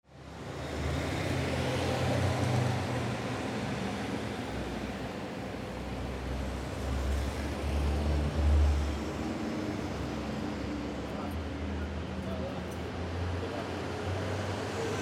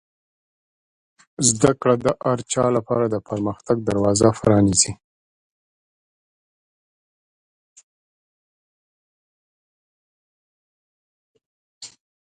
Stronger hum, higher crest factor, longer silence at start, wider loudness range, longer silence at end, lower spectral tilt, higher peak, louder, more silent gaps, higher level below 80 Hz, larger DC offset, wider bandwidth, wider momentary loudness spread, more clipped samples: neither; second, 16 dB vs 24 dB; second, 0.1 s vs 1.4 s; about the same, 5 LU vs 4 LU; second, 0 s vs 0.4 s; first, -6 dB/octave vs -4.5 dB/octave; second, -16 dBFS vs 0 dBFS; second, -34 LUFS vs -19 LUFS; second, none vs 5.04-7.76 s, 7.83-11.35 s, 11.46-11.81 s; first, -38 dBFS vs -50 dBFS; neither; first, 14.5 kHz vs 11.5 kHz; about the same, 8 LU vs 8 LU; neither